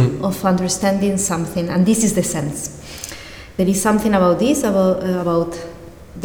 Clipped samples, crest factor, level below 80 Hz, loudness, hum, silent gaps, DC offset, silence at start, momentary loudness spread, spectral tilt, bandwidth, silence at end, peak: under 0.1%; 16 dB; -44 dBFS; -17 LUFS; none; none; under 0.1%; 0 s; 16 LU; -5.5 dB/octave; over 20 kHz; 0 s; -2 dBFS